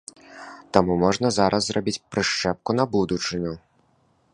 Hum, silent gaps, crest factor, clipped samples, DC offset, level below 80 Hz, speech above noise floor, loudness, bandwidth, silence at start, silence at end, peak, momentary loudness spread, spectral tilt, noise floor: none; none; 24 dB; under 0.1%; under 0.1%; -50 dBFS; 41 dB; -23 LUFS; 11 kHz; 0.3 s; 0.75 s; 0 dBFS; 20 LU; -4.5 dB/octave; -63 dBFS